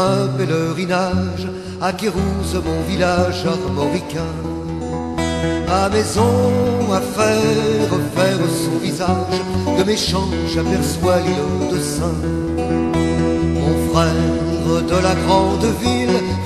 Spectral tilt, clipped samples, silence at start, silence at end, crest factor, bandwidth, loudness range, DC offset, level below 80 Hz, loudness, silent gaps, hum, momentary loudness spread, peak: -5.5 dB/octave; under 0.1%; 0 s; 0 s; 16 dB; 14 kHz; 3 LU; under 0.1%; -32 dBFS; -18 LUFS; none; none; 5 LU; 0 dBFS